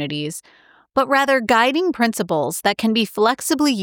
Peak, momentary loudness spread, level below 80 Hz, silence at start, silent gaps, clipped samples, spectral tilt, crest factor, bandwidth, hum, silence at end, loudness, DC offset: -4 dBFS; 9 LU; -60 dBFS; 0 s; none; under 0.1%; -3.5 dB/octave; 14 dB; 19.5 kHz; none; 0 s; -18 LUFS; under 0.1%